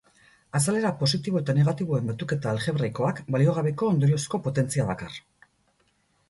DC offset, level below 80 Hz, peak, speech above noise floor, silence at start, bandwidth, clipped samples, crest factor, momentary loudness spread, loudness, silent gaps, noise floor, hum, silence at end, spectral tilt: under 0.1%; -58 dBFS; -10 dBFS; 43 dB; 0.55 s; 12 kHz; under 0.1%; 16 dB; 6 LU; -25 LUFS; none; -68 dBFS; none; 1.1 s; -6 dB/octave